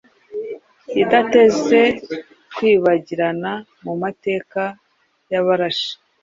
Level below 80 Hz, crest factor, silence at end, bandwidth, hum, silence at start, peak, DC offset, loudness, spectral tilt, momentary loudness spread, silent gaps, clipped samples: -60 dBFS; 18 dB; 0.3 s; 7.6 kHz; none; 0.3 s; 0 dBFS; under 0.1%; -18 LUFS; -5 dB/octave; 17 LU; none; under 0.1%